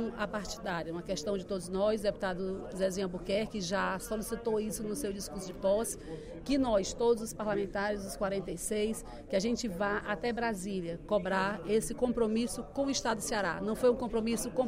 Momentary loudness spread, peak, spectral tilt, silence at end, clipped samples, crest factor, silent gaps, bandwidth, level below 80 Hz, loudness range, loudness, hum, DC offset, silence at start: 7 LU; -16 dBFS; -4.5 dB/octave; 0 s; under 0.1%; 16 dB; none; 16 kHz; -52 dBFS; 3 LU; -33 LUFS; none; under 0.1%; 0 s